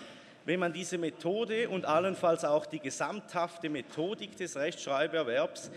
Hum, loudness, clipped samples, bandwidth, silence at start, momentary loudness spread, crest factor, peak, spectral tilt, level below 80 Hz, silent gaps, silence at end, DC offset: none; -33 LUFS; under 0.1%; 13.5 kHz; 0 s; 8 LU; 18 dB; -14 dBFS; -4.5 dB/octave; -82 dBFS; none; 0 s; under 0.1%